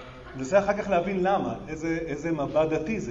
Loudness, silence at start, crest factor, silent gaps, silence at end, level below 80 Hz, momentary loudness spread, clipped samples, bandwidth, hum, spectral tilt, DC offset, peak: -26 LUFS; 0 s; 18 dB; none; 0 s; -50 dBFS; 9 LU; under 0.1%; 8 kHz; none; -6.5 dB/octave; under 0.1%; -8 dBFS